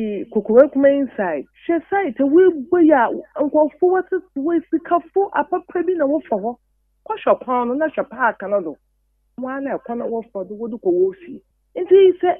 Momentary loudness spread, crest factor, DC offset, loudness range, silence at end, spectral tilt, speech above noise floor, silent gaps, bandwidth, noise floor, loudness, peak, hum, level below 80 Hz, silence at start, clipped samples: 15 LU; 18 dB; under 0.1%; 8 LU; 0 s; -9.5 dB/octave; 47 dB; none; 3.6 kHz; -65 dBFS; -18 LUFS; 0 dBFS; none; -62 dBFS; 0 s; under 0.1%